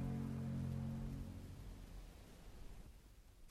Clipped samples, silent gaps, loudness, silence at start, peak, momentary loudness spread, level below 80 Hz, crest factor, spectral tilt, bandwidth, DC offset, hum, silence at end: under 0.1%; none; -48 LUFS; 0 s; -34 dBFS; 18 LU; -56 dBFS; 14 dB; -7.5 dB/octave; 15 kHz; under 0.1%; none; 0 s